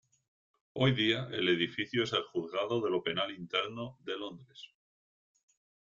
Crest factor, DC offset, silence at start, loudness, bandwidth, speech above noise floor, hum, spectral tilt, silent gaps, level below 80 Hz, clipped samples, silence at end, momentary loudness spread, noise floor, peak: 20 dB; under 0.1%; 0.75 s; -32 LUFS; 7.6 kHz; over 57 dB; none; -6 dB/octave; none; -68 dBFS; under 0.1%; 1.25 s; 15 LU; under -90 dBFS; -14 dBFS